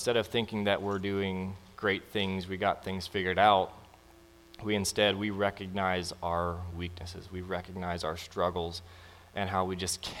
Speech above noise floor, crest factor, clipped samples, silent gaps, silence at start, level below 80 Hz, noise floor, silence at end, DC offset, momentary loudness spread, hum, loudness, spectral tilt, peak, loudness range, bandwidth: 25 dB; 22 dB; under 0.1%; none; 0 s; -56 dBFS; -57 dBFS; 0 s; under 0.1%; 12 LU; none; -32 LUFS; -4.5 dB/octave; -10 dBFS; 6 LU; 17 kHz